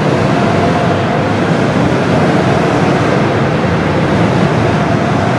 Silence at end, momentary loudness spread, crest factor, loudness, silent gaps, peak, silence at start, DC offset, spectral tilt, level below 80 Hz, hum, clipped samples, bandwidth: 0 s; 2 LU; 12 dB; -12 LUFS; none; 0 dBFS; 0 s; under 0.1%; -7 dB/octave; -36 dBFS; none; under 0.1%; 11.5 kHz